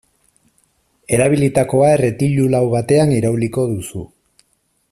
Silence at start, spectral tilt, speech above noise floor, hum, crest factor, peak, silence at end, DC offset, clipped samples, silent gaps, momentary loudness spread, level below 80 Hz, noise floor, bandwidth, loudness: 1.1 s; -7 dB/octave; 49 dB; none; 16 dB; 0 dBFS; 0.85 s; under 0.1%; under 0.1%; none; 8 LU; -48 dBFS; -64 dBFS; 14 kHz; -15 LUFS